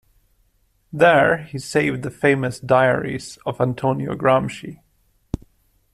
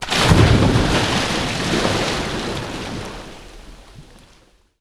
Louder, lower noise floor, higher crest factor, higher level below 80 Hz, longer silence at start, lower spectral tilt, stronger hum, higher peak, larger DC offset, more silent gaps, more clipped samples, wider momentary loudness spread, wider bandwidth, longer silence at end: about the same, -19 LUFS vs -18 LUFS; first, -63 dBFS vs -53 dBFS; about the same, 18 dB vs 20 dB; second, -48 dBFS vs -30 dBFS; first, 0.95 s vs 0 s; about the same, -6 dB/octave vs -5 dB/octave; neither; about the same, -2 dBFS vs 0 dBFS; neither; neither; neither; about the same, 17 LU vs 19 LU; about the same, 14 kHz vs 14 kHz; second, 0.55 s vs 0.75 s